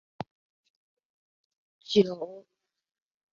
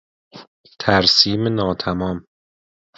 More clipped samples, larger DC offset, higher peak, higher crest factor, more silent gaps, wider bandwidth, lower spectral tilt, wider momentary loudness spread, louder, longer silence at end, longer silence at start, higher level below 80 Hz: neither; neither; second, -10 dBFS vs 0 dBFS; about the same, 24 dB vs 20 dB; second, none vs 0.47-0.64 s; about the same, 7.4 kHz vs 7.8 kHz; about the same, -5 dB/octave vs -4.5 dB/octave; first, 19 LU vs 13 LU; second, -27 LUFS vs -17 LUFS; first, 0.95 s vs 0.8 s; first, 1.9 s vs 0.35 s; second, -72 dBFS vs -44 dBFS